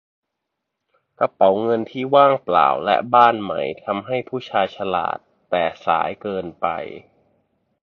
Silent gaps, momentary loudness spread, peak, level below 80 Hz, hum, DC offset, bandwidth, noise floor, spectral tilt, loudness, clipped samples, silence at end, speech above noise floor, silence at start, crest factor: none; 12 LU; 0 dBFS; -60 dBFS; none; under 0.1%; 6.4 kHz; -79 dBFS; -7 dB/octave; -19 LUFS; under 0.1%; 0.85 s; 60 dB; 1.2 s; 20 dB